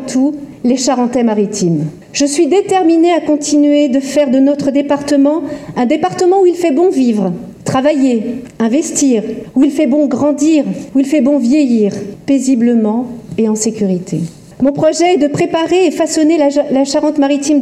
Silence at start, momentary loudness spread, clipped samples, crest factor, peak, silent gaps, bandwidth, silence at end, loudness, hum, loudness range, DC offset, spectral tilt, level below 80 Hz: 0 s; 7 LU; under 0.1%; 12 dB; 0 dBFS; none; 13 kHz; 0 s; -12 LUFS; none; 2 LU; under 0.1%; -5 dB/octave; -52 dBFS